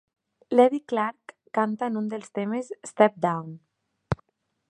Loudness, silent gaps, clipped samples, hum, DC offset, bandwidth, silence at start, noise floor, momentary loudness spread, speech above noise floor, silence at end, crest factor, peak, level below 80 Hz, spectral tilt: -26 LUFS; none; under 0.1%; none; under 0.1%; 10.5 kHz; 0.5 s; -66 dBFS; 13 LU; 41 dB; 0.55 s; 22 dB; -4 dBFS; -56 dBFS; -6.5 dB/octave